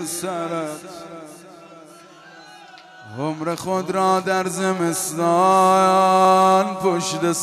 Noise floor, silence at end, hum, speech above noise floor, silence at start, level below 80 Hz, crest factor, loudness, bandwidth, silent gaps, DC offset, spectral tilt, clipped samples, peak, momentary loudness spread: -44 dBFS; 0 s; none; 26 dB; 0 s; -68 dBFS; 16 dB; -18 LUFS; 14 kHz; none; under 0.1%; -4.5 dB/octave; under 0.1%; -4 dBFS; 19 LU